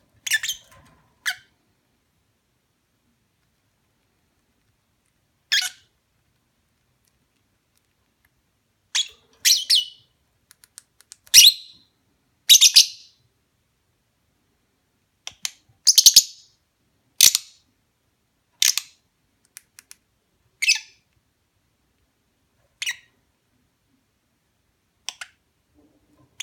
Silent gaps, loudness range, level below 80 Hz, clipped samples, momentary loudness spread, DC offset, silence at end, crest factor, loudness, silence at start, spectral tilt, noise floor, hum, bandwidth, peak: none; 22 LU; -66 dBFS; under 0.1%; 25 LU; under 0.1%; 3.5 s; 24 dB; -16 LUFS; 0.25 s; 4.5 dB/octave; -70 dBFS; none; 17.5 kHz; 0 dBFS